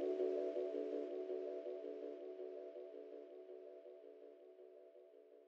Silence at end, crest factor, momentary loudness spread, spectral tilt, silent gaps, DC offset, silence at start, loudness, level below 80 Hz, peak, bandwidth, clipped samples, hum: 0 s; 16 dB; 20 LU; -5 dB/octave; none; under 0.1%; 0 s; -47 LUFS; under -90 dBFS; -30 dBFS; 6.6 kHz; under 0.1%; none